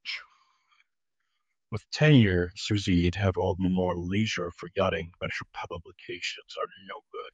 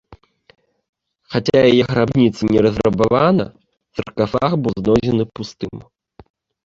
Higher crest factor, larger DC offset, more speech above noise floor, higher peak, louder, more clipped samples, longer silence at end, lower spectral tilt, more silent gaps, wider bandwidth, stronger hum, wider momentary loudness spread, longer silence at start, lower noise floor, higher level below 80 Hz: about the same, 20 dB vs 16 dB; neither; first, 56 dB vs 31 dB; second, -8 dBFS vs -2 dBFS; second, -28 LUFS vs -16 LUFS; neither; second, 0.05 s vs 0.85 s; second, -6 dB/octave vs -7.5 dB/octave; second, none vs 0.89-0.93 s; first, 9 kHz vs 7.8 kHz; neither; first, 19 LU vs 16 LU; about the same, 0.05 s vs 0.1 s; first, -84 dBFS vs -47 dBFS; second, -52 dBFS vs -44 dBFS